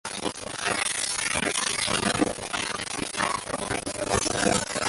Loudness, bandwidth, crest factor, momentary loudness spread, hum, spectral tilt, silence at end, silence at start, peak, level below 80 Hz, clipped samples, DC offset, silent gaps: -26 LUFS; 12 kHz; 20 dB; 6 LU; none; -2 dB/octave; 0 s; 0.05 s; -8 dBFS; -50 dBFS; under 0.1%; under 0.1%; none